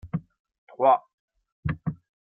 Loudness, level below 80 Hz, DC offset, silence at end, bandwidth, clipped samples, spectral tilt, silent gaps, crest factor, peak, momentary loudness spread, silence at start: -27 LUFS; -52 dBFS; under 0.1%; 0.35 s; 4.2 kHz; under 0.1%; -11 dB/octave; 0.39-0.45 s, 0.58-0.67 s, 1.13-1.28 s, 1.52-1.63 s; 20 dB; -8 dBFS; 14 LU; 0.05 s